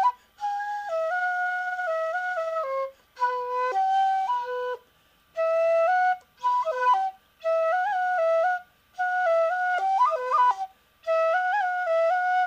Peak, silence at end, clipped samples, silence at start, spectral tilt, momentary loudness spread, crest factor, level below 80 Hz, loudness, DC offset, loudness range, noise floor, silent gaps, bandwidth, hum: -12 dBFS; 0 s; under 0.1%; 0 s; -1 dB/octave; 9 LU; 12 dB; -74 dBFS; -25 LUFS; under 0.1%; 4 LU; -62 dBFS; none; 15 kHz; none